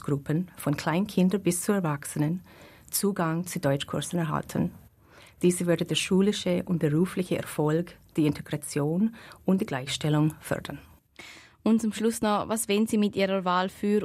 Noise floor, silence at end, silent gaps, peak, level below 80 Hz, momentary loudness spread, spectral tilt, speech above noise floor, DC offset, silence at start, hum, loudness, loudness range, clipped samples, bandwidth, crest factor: -55 dBFS; 0 s; none; -12 dBFS; -60 dBFS; 8 LU; -5.5 dB/octave; 28 dB; under 0.1%; 0.05 s; none; -27 LUFS; 3 LU; under 0.1%; 15.5 kHz; 16 dB